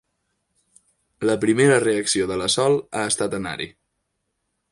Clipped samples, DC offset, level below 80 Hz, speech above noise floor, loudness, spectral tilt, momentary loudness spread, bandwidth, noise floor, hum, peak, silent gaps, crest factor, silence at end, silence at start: under 0.1%; under 0.1%; -56 dBFS; 55 dB; -21 LUFS; -3.5 dB/octave; 12 LU; 11.5 kHz; -76 dBFS; none; -4 dBFS; none; 18 dB; 1.05 s; 1.2 s